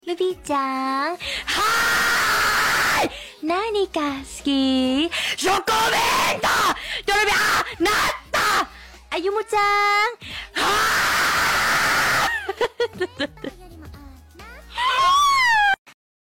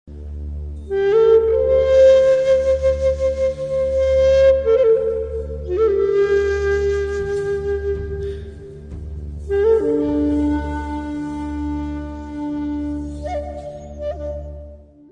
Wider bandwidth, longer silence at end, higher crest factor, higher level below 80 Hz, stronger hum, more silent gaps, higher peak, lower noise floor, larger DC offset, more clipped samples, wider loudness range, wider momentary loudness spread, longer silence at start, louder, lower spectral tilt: first, 17 kHz vs 9.2 kHz; about the same, 0.4 s vs 0.3 s; about the same, 10 dB vs 14 dB; second, -46 dBFS vs -32 dBFS; neither; first, 15.78-15.85 s vs none; second, -12 dBFS vs -4 dBFS; about the same, -42 dBFS vs -40 dBFS; neither; neither; second, 2 LU vs 11 LU; second, 9 LU vs 18 LU; about the same, 0.05 s vs 0.05 s; about the same, -20 LUFS vs -18 LUFS; second, -2 dB/octave vs -7.5 dB/octave